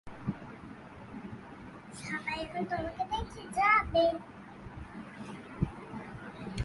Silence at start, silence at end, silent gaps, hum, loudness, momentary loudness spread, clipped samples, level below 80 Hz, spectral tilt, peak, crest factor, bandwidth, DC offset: 0.05 s; 0 s; none; none; -33 LUFS; 22 LU; under 0.1%; -52 dBFS; -5.5 dB/octave; -14 dBFS; 22 dB; 11.5 kHz; under 0.1%